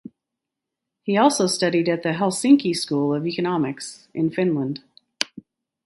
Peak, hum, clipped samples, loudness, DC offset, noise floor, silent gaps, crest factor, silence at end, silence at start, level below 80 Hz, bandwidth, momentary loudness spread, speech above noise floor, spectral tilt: 0 dBFS; none; under 0.1%; -21 LUFS; under 0.1%; -84 dBFS; none; 22 dB; 0.45 s; 1.05 s; -68 dBFS; 12 kHz; 12 LU; 63 dB; -5 dB/octave